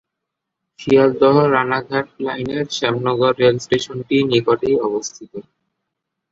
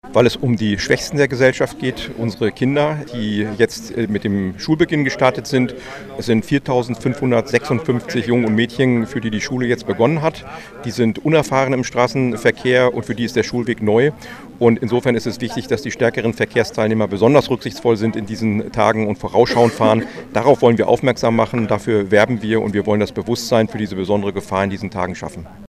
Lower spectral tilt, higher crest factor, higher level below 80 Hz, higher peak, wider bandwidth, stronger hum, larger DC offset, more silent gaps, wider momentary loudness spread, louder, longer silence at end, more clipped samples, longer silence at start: about the same, -5.5 dB/octave vs -6 dB/octave; about the same, 16 dB vs 18 dB; second, -54 dBFS vs -46 dBFS; about the same, -2 dBFS vs 0 dBFS; second, 7.8 kHz vs 14.5 kHz; neither; neither; neither; first, 13 LU vs 8 LU; about the same, -17 LUFS vs -17 LUFS; first, 0.9 s vs 0.05 s; neither; first, 0.8 s vs 0.05 s